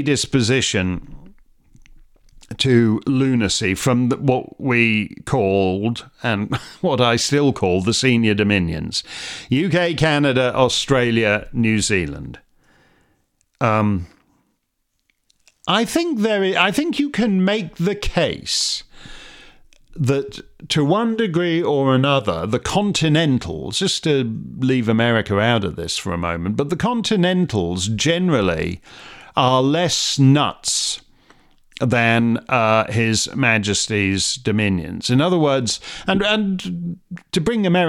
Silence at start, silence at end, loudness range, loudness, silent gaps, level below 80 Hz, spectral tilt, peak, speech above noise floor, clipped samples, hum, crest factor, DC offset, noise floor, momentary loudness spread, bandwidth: 0 s; 0 s; 4 LU; -18 LUFS; none; -44 dBFS; -4.5 dB/octave; 0 dBFS; 53 dB; under 0.1%; none; 18 dB; under 0.1%; -71 dBFS; 8 LU; 16 kHz